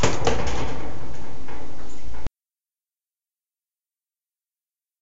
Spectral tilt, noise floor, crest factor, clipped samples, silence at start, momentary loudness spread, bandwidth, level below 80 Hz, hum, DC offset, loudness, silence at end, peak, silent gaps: -4.5 dB/octave; under -90 dBFS; 18 dB; under 0.1%; 0 s; 16 LU; 8 kHz; -40 dBFS; none; under 0.1%; -30 LUFS; 0 s; -4 dBFS; none